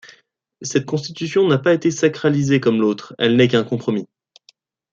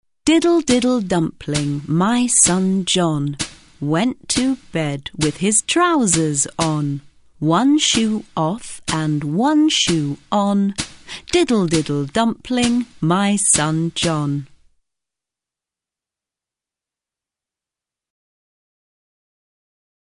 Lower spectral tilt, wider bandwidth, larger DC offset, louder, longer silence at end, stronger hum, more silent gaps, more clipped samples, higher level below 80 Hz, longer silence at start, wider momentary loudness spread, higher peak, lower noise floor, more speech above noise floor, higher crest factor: first, -5.5 dB/octave vs -4 dB/octave; second, 7.8 kHz vs 11 kHz; neither; about the same, -18 LUFS vs -18 LUFS; second, 0.85 s vs 5.65 s; neither; neither; neither; second, -62 dBFS vs -48 dBFS; first, 0.6 s vs 0.25 s; about the same, 9 LU vs 9 LU; about the same, -2 dBFS vs -2 dBFS; second, -57 dBFS vs -88 dBFS; second, 39 dB vs 71 dB; about the same, 16 dB vs 18 dB